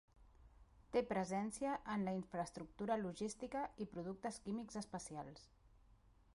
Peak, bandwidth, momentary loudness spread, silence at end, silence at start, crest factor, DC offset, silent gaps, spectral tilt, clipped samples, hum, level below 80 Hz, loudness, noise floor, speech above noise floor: -26 dBFS; 11.5 kHz; 8 LU; 0.6 s; 0.2 s; 18 dB; under 0.1%; none; -5.5 dB/octave; under 0.1%; none; -68 dBFS; -44 LUFS; -69 dBFS; 25 dB